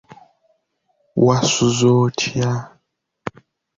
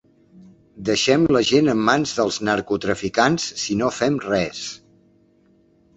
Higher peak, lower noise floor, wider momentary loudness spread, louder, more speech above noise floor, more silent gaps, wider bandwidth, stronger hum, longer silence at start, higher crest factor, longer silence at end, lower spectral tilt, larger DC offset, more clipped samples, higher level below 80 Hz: about the same, -2 dBFS vs -2 dBFS; first, -68 dBFS vs -57 dBFS; first, 18 LU vs 10 LU; first, -17 LUFS vs -20 LUFS; first, 52 dB vs 38 dB; neither; about the same, 7.8 kHz vs 8.2 kHz; neither; first, 1.15 s vs 0.35 s; about the same, 18 dB vs 20 dB; second, 0.5 s vs 1.2 s; about the same, -5 dB/octave vs -4 dB/octave; neither; neither; about the same, -54 dBFS vs -52 dBFS